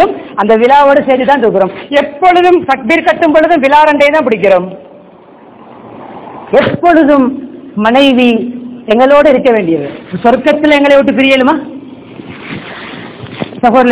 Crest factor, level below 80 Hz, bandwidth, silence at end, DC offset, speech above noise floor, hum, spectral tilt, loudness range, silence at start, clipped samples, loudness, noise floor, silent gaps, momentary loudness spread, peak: 8 dB; -44 dBFS; 4 kHz; 0 s; under 0.1%; 29 dB; none; -9 dB/octave; 4 LU; 0 s; 4%; -8 LUFS; -36 dBFS; none; 18 LU; 0 dBFS